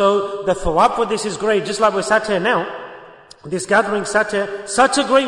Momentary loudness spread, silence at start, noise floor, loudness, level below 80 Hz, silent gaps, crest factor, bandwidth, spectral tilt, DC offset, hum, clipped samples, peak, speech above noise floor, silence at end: 9 LU; 0 s; -41 dBFS; -17 LUFS; -42 dBFS; none; 16 dB; 11 kHz; -3.5 dB/octave; under 0.1%; none; under 0.1%; -2 dBFS; 24 dB; 0 s